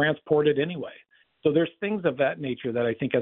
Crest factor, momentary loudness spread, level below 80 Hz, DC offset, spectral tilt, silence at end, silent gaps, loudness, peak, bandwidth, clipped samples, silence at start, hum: 18 dB; 8 LU; -66 dBFS; under 0.1%; -10.5 dB/octave; 0 s; none; -26 LUFS; -8 dBFS; 4 kHz; under 0.1%; 0 s; none